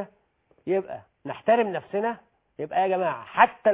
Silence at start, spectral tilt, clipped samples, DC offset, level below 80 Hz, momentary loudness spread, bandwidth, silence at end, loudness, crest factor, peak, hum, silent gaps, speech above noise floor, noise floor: 0 s; -9 dB/octave; under 0.1%; under 0.1%; -72 dBFS; 18 LU; 3.9 kHz; 0 s; -25 LUFS; 22 dB; -2 dBFS; none; none; 41 dB; -65 dBFS